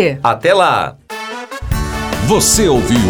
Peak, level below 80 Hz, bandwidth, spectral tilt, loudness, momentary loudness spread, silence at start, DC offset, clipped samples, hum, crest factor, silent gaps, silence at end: 0 dBFS; -28 dBFS; over 20 kHz; -4 dB/octave; -13 LUFS; 15 LU; 0 s; under 0.1%; under 0.1%; none; 14 dB; none; 0 s